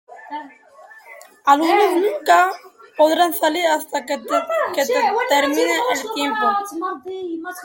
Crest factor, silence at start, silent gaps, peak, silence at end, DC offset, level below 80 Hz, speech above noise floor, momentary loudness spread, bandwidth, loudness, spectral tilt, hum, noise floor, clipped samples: 18 dB; 0.1 s; none; -2 dBFS; 0 s; under 0.1%; -70 dBFS; 26 dB; 14 LU; 17 kHz; -18 LUFS; -1.5 dB/octave; none; -44 dBFS; under 0.1%